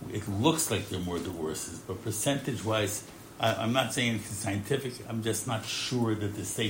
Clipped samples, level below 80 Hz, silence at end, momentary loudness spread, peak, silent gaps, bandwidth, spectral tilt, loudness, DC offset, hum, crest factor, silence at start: under 0.1%; -62 dBFS; 0 s; 8 LU; -10 dBFS; none; 16.5 kHz; -4 dB/octave; -31 LUFS; under 0.1%; none; 20 dB; 0 s